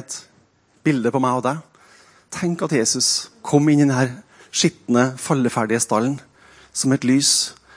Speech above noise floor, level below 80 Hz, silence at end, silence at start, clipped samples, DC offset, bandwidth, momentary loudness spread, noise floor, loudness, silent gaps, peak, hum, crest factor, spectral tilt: 39 dB; -64 dBFS; 0.25 s; 0 s; under 0.1%; under 0.1%; 10.5 kHz; 12 LU; -58 dBFS; -19 LUFS; none; -2 dBFS; none; 18 dB; -4 dB/octave